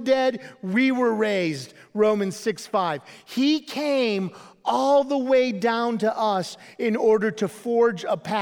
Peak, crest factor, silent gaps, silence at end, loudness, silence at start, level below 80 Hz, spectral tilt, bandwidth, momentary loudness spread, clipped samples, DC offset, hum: -8 dBFS; 14 dB; none; 0 s; -23 LUFS; 0 s; -74 dBFS; -5 dB/octave; 17 kHz; 9 LU; under 0.1%; under 0.1%; none